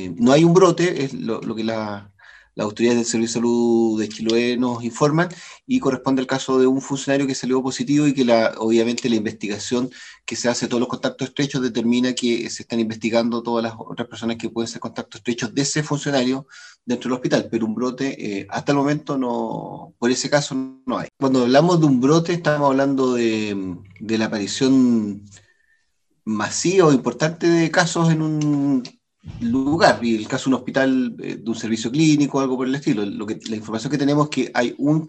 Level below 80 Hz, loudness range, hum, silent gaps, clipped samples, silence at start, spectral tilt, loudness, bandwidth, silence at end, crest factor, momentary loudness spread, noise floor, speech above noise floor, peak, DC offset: -60 dBFS; 5 LU; none; none; under 0.1%; 0 s; -5 dB/octave; -20 LUFS; 9 kHz; 0 s; 20 dB; 11 LU; -70 dBFS; 50 dB; 0 dBFS; under 0.1%